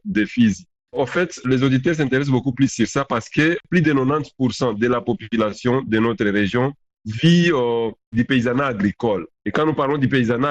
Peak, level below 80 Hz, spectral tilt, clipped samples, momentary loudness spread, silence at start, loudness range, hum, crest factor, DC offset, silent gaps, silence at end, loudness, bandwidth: -6 dBFS; -50 dBFS; -6.5 dB/octave; under 0.1%; 6 LU; 0.05 s; 1 LU; none; 14 dB; under 0.1%; 8.07-8.12 s; 0 s; -19 LUFS; 8.6 kHz